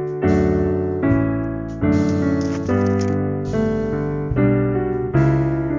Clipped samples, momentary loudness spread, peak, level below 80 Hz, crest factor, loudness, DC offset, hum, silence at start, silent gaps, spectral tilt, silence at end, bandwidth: under 0.1%; 5 LU; -4 dBFS; -34 dBFS; 14 dB; -19 LUFS; under 0.1%; none; 0 s; none; -9 dB/octave; 0 s; 7.6 kHz